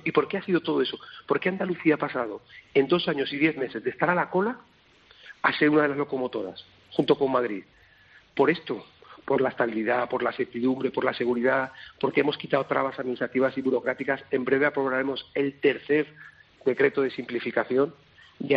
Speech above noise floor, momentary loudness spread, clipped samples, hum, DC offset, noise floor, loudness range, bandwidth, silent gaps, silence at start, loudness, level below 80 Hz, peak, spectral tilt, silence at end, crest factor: 31 dB; 8 LU; under 0.1%; none; under 0.1%; -57 dBFS; 1 LU; 5.4 kHz; none; 0.05 s; -26 LUFS; -68 dBFS; -6 dBFS; -3.5 dB/octave; 0 s; 20 dB